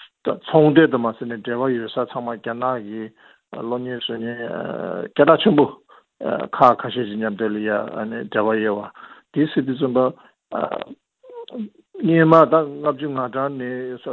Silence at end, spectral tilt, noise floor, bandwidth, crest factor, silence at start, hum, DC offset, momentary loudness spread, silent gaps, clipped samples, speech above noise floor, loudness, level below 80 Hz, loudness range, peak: 0 s; -9 dB/octave; -40 dBFS; 5.6 kHz; 20 dB; 0 s; none; under 0.1%; 17 LU; none; under 0.1%; 20 dB; -20 LUFS; -64 dBFS; 7 LU; 0 dBFS